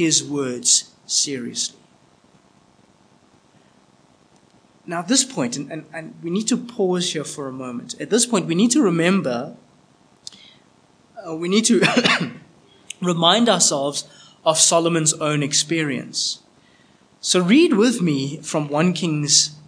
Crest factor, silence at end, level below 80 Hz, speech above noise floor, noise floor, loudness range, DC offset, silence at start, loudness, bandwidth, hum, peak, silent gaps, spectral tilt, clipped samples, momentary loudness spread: 20 dB; 0.1 s; -72 dBFS; 36 dB; -55 dBFS; 8 LU; under 0.1%; 0 s; -19 LUFS; 10.5 kHz; none; 0 dBFS; none; -3 dB/octave; under 0.1%; 16 LU